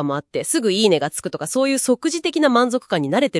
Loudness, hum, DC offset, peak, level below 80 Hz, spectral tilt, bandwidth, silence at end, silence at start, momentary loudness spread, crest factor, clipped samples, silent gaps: -19 LUFS; none; under 0.1%; -2 dBFS; -66 dBFS; -4 dB/octave; 12 kHz; 0 s; 0 s; 7 LU; 16 dB; under 0.1%; none